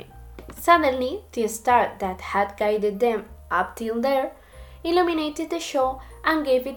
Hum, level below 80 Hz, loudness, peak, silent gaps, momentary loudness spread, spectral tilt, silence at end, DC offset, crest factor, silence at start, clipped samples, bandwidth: none; -48 dBFS; -23 LUFS; -4 dBFS; none; 11 LU; -4 dB/octave; 0 s; under 0.1%; 18 dB; 0 s; under 0.1%; 19 kHz